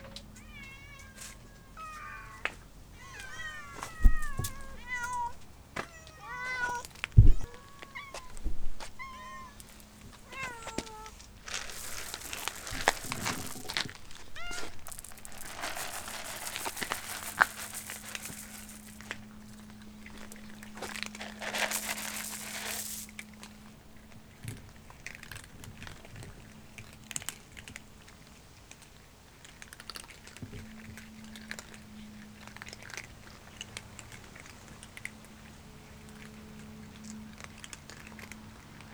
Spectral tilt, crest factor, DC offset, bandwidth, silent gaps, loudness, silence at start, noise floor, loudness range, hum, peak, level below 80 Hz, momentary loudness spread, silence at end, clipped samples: -3.5 dB/octave; 32 dB; under 0.1%; over 20 kHz; none; -37 LUFS; 0 s; -55 dBFS; 15 LU; none; -2 dBFS; -38 dBFS; 19 LU; 0 s; under 0.1%